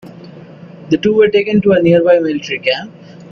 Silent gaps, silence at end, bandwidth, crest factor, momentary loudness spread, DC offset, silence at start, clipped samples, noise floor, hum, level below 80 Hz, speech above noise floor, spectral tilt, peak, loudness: none; 0.05 s; 7 kHz; 14 dB; 8 LU; under 0.1%; 0.05 s; under 0.1%; -35 dBFS; none; -50 dBFS; 23 dB; -7 dB/octave; 0 dBFS; -12 LUFS